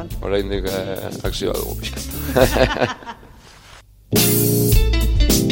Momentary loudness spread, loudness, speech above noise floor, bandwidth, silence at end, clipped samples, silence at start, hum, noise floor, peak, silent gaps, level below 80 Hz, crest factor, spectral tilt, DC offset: 11 LU; -19 LUFS; 26 dB; 17 kHz; 0 s; under 0.1%; 0 s; none; -45 dBFS; 0 dBFS; none; -24 dBFS; 18 dB; -4.5 dB/octave; under 0.1%